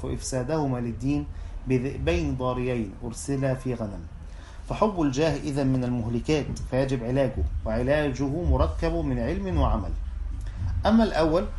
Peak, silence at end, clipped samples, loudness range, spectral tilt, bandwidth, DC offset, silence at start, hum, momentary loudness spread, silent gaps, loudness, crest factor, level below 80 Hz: -6 dBFS; 0 s; under 0.1%; 3 LU; -7 dB/octave; 11.5 kHz; under 0.1%; 0 s; none; 11 LU; none; -27 LUFS; 20 dB; -34 dBFS